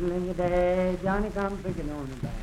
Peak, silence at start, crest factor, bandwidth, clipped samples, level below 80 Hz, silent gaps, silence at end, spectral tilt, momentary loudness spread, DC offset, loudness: -12 dBFS; 0 s; 14 dB; 14 kHz; under 0.1%; -38 dBFS; none; 0 s; -7.5 dB/octave; 11 LU; under 0.1%; -28 LUFS